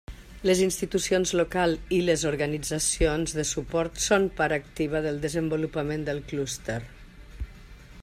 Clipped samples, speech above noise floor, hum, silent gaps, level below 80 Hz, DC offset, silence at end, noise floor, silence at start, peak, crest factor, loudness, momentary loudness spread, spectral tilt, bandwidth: under 0.1%; 20 dB; none; none; -42 dBFS; under 0.1%; 0 s; -46 dBFS; 0.1 s; -8 dBFS; 20 dB; -26 LUFS; 10 LU; -4 dB/octave; 15.5 kHz